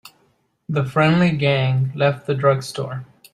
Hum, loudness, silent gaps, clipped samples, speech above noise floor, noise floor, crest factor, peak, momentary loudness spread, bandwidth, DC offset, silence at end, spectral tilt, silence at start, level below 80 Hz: none; -19 LUFS; none; under 0.1%; 45 dB; -63 dBFS; 18 dB; -2 dBFS; 12 LU; 13 kHz; under 0.1%; 0.3 s; -7 dB/octave; 0.05 s; -58 dBFS